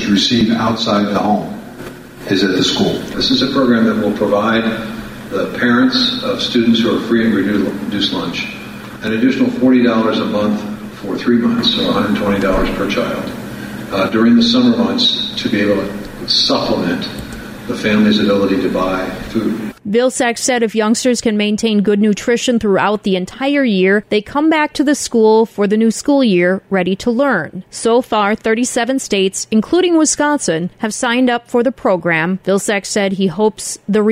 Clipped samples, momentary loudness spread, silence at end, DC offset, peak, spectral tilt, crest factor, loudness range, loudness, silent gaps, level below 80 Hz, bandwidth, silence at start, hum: under 0.1%; 10 LU; 0 s; under 0.1%; -2 dBFS; -4.5 dB/octave; 12 dB; 2 LU; -14 LUFS; none; -40 dBFS; 15.5 kHz; 0 s; none